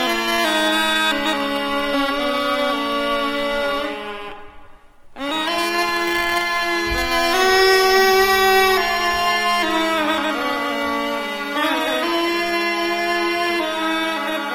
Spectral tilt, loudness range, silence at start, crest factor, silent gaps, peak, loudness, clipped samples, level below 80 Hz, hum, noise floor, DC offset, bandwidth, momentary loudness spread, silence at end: -2 dB/octave; 7 LU; 0 s; 18 dB; none; -2 dBFS; -18 LUFS; under 0.1%; -44 dBFS; none; -42 dBFS; 0.1%; 17.5 kHz; 8 LU; 0 s